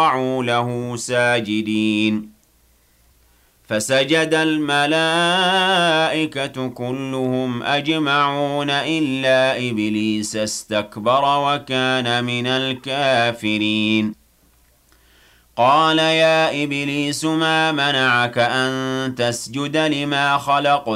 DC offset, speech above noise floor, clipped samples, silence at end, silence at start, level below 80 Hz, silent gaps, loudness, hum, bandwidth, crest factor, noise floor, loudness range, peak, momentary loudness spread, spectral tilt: under 0.1%; 38 dB; under 0.1%; 0 s; 0 s; -58 dBFS; none; -18 LUFS; none; 15.5 kHz; 14 dB; -57 dBFS; 4 LU; -6 dBFS; 8 LU; -4 dB/octave